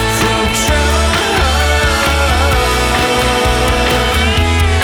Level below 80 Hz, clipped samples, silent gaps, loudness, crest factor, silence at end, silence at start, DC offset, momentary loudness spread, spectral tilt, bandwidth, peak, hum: -18 dBFS; under 0.1%; none; -12 LUFS; 10 dB; 0 s; 0 s; under 0.1%; 1 LU; -4 dB/octave; 19.5 kHz; -2 dBFS; none